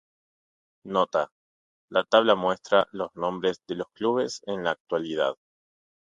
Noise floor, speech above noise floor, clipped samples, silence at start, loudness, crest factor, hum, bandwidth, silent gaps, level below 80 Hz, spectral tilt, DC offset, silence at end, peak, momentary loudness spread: under -90 dBFS; over 65 dB; under 0.1%; 0.85 s; -26 LUFS; 24 dB; none; 9.2 kHz; 1.32-1.88 s, 4.80-4.85 s; -68 dBFS; -4.5 dB/octave; under 0.1%; 0.8 s; -4 dBFS; 10 LU